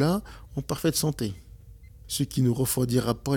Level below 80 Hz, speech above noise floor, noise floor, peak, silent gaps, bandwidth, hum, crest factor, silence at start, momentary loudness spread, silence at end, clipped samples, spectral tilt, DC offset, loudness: -48 dBFS; 22 dB; -48 dBFS; -12 dBFS; none; 18.5 kHz; none; 16 dB; 0 s; 11 LU; 0 s; under 0.1%; -5.5 dB/octave; under 0.1%; -27 LUFS